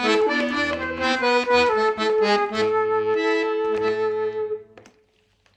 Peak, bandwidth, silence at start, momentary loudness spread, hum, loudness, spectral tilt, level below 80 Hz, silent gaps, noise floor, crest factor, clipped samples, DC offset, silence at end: -6 dBFS; 9 kHz; 0 s; 7 LU; none; -21 LUFS; -4 dB/octave; -56 dBFS; none; -62 dBFS; 16 dB; under 0.1%; under 0.1%; 0.75 s